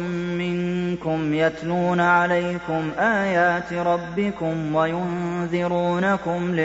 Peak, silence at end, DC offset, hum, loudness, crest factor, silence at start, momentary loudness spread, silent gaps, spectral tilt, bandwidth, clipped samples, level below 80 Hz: -6 dBFS; 0 s; under 0.1%; none; -22 LUFS; 16 dB; 0 s; 7 LU; none; -7 dB/octave; 8 kHz; under 0.1%; -52 dBFS